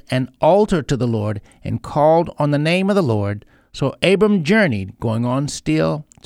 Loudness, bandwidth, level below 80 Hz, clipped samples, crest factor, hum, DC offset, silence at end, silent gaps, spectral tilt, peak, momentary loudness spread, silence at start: -18 LUFS; 13 kHz; -44 dBFS; under 0.1%; 16 dB; none; under 0.1%; 0.25 s; none; -6.5 dB/octave; 0 dBFS; 11 LU; 0.1 s